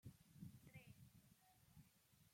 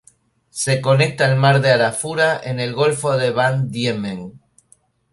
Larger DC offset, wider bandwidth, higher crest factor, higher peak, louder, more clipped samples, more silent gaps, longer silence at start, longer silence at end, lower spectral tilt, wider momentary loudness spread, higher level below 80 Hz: neither; first, 16.5 kHz vs 11.5 kHz; about the same, 20 dB vs 16 dB; second, -46 dBFS vs -2 dBFS; second, -64 LUFS vs -17 LUFS; neither; neither; second, 0.05 s vs 0.55 s; second, 0 s vs 0.75 s; about the same, -5.5 dB/octave vs -5 dB/octave; second, 6 LU vs 11 LU; second, -82 dBFS vs -56 dBFS